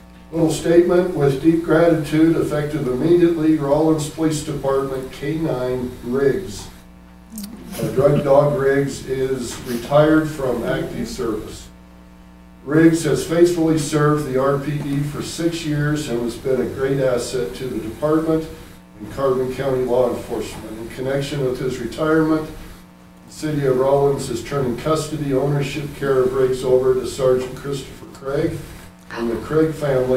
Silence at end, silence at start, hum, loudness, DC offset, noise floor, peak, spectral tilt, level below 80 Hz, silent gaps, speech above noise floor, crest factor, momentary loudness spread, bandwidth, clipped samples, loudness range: 0 s; 0 s; none; -19 LUFS; under 0.1%; -44 dBFS; 0 dBFS; -6.5 dB/octave; -42 dBFS; none; 25 dB; 18 dB; 14 LU; 16 kHz; under 0.1%; 5 LU